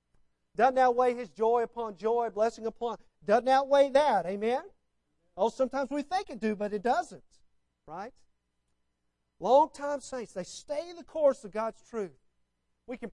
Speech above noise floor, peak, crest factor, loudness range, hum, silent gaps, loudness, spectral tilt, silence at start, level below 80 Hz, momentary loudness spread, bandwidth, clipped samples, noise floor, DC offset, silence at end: 50 dB; -10 dBFS; 20 dB; 7 LU; 60 Hz at -70 dBFS; none; -29 LUFS; -4.5 dB/octave; 0.6 s; -66 dBFS; 17 LU; 11 kHz; under 0.1%; -79 dBFS; under 0.1%; 0.05 s